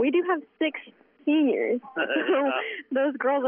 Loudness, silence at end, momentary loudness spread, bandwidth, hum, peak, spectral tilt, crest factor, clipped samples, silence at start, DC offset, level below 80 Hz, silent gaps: -26 LUFS; 0 s; 6 LU; 3.6 kHz; none; -12 dBFS; -1 dB/octave; 12 dB; under 0.1%; 0 s; under 0.1%; -86 dBFS; none